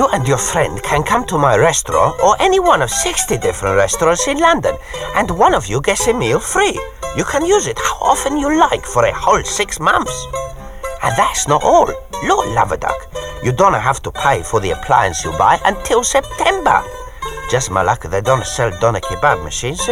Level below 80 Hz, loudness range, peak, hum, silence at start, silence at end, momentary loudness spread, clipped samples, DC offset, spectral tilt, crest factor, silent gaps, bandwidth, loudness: -32 dBFS; 3 LU; 0 dBFS; none; 0 s; 0 s; 9 LU; under 0.1%; under 0.1%; -3.5 dB/octave; 14 dB; none; 16.5 kHz; -15 LUFS